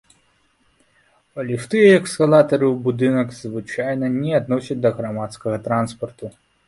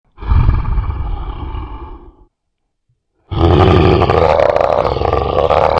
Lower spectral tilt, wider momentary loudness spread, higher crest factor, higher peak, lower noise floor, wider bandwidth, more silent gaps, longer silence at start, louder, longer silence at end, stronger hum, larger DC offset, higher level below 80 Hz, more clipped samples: second, -6.5 dB/octave vs -8.5 dB/octave; about the same, 17 LU vs 17 LU; about the same, 18 dB vs 14 dB; about the same, -2 dBFS vs 0 dBFS; second, -62 dBFS vs -70 dBFS; first, 11.5 kHz vs 7.4 kHz; neither; first, 1.35 s vs 0.2 s; second, -19 LUFS vs -13 LUFS; first, 0.35 s vs 0 s; neither; neither; second, -58 dBFS vs -22 dBFS; neither